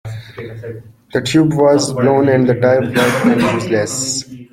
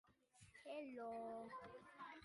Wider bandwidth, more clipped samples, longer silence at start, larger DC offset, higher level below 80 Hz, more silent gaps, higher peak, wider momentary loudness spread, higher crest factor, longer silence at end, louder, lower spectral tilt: first, 16.5 kHz vs 11.5 kHz; neither; about the same, 0.05 s vs 0.05 s; neither; first, -50 dBFS vs -84 dBFS; neither; first, -2 dBFS vs -42 dBFS; first, 18 LU vs 10 LU; about the same, 14 dB vs 14 dB; about the same, 0.1 s vs 0 s; first, -14 LUFS vs -54 LUFS; about the same, -5 dB/octave vs -5 dB/octave